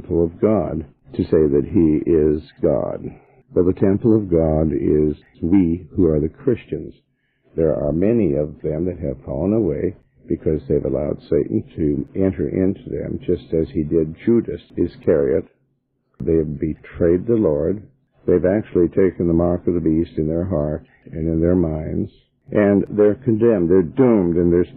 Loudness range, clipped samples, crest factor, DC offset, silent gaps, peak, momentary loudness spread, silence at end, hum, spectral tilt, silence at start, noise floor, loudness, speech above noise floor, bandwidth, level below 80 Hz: 3 LU; under 0.1%; 14 dB; under 0.1%; none; -4 dBFS; 10 LU; 0 s; none; -13 dB/octave; 0 s; -68 dBFS; -19 LUFS; 50 dB; 4.5 kHz; -38 dBFS